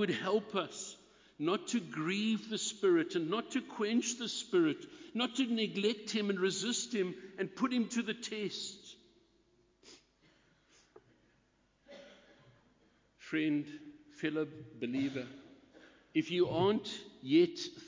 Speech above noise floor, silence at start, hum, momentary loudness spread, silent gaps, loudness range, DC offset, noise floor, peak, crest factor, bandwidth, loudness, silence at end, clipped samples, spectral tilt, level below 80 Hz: 38 dB; 0 s; none; 14 LU; none; 9 LU; under 0.1%; -73 dBFS; -18 dBFS; 18 dB; 7.8 kHz; -35 LUFS; 0 s; under 0.1%; -4 dB/octave; -76 dBFS